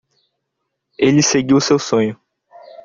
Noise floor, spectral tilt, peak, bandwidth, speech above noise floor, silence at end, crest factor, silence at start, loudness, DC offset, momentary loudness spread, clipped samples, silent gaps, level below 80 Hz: -75 dBFS; -4.5 dB/octave; -2 dBFS; 7.6 kHz; 61 dB; 0.1 s; 16 dB; 1 s; -15 LUFS; under 0.1%; 5 LU; under 0.1%; none; -56 dBFS